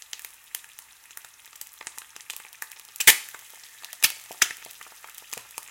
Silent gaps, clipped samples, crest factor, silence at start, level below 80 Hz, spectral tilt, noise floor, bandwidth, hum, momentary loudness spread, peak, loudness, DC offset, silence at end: none; under 0.1%; 30 dB; 0.55 s; -66 dBFS; 2.5 dB/octave; -50 dBFS; 17 kHz; none; 27 LU; 0 dBFS; -21 LUFS; under 0.1%; 0.3 s